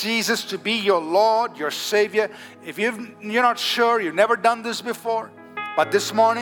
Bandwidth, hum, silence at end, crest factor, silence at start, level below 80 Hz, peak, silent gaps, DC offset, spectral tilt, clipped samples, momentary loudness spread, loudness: 19.5 kHz; none; 0 s; 18 dB; 0 s; -80 dBFS; -4 dBFS; none; under 0.1%; -2.5 dB/octave; under 0.1%; 9 LU; -21 LUFS